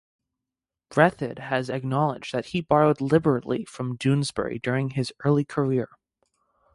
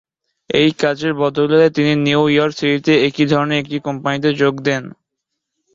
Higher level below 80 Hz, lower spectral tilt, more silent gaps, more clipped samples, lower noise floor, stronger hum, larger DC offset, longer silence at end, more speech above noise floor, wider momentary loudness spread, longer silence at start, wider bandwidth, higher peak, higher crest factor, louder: about the same, -58 dBFS vs -54 dBFS; about the same, -7 dB/octave vs -6 dB/octave; neither; neither; first, -88 dBFS vs -78 dBFS; neither; neither; about the same, 0.9 s vs 0.85 s; about the same, 64 dB vs 62 dB; about the same, 9 LU vs 7 LU; first, 0.9 s vs 0.5 s; first, 11.5 kHz vs 7.6 kHz; second, -6 dBFS vs -2 dBFS; about the same, 20 dB vs 16 dB; second, -25 LUFS vs -16 LUFS